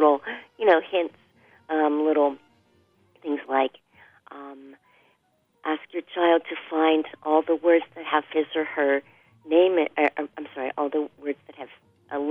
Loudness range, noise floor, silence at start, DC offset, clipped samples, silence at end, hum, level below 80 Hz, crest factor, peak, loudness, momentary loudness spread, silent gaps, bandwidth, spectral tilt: 8 LU; -68 dBFS; 0 s; under 0.1%; under 0.1%; 0 s; none; -78 dBFS; 20 dB; -6 dBFS; -24 LUFS; 16 LU; none; 4.3 kHz; -6 dB/octave